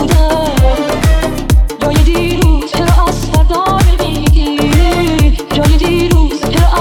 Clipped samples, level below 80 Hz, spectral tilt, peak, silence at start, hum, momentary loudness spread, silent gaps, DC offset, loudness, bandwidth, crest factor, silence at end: under 0.1%; -12 dBFS; -6 dB/octave; 0 dBFS; 0 s; none; 2 LU; none; under 0.1%; -11 LUFS; 17.5 kHz; 10 dB; 0 s